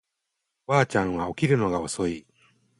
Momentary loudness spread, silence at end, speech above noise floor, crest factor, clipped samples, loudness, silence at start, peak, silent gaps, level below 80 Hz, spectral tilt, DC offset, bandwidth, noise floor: 10 LU; 0.6 s; 57 dB; 20 dB; under 0.1%; -25 LUFS; 0.7 s; -6 dBFS; none; -52 dBFS; -6 dB/octave; under 0.1%; 11.5 kHz; -81 dBFS